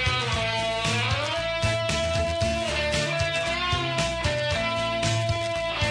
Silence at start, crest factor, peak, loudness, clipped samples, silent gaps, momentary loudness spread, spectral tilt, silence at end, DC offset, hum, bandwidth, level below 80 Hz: 0 s; 14 dB; -12 dBFS; -25 LUFS; under 0.1%; none; 1 LU; -4 dB/octave; 0 s; under 0.1%; none; 10.5 kHz; -40 dBFS